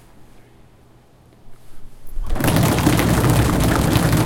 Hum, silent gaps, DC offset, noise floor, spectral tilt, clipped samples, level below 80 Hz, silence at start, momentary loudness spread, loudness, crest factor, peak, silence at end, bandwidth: none; none; under 0.1%; -49 dBFS; -5.5 dB/octave; under 0.1%; -28 dBFS; 0.2 s; 14 LU; -17 LUFS; 18 dB; 0 dBFS; 0 s; 17 kHz